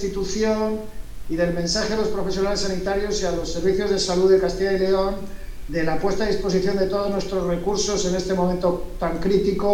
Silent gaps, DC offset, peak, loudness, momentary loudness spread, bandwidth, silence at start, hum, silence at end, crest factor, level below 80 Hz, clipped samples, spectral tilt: none; under 0.1%; -6 dBFS; -22 LUFS; 7 LU; 16 kHz; 0 s; none; 0 s; 14 dB; -34 dBFS; under 0.1%; -5 dB/octave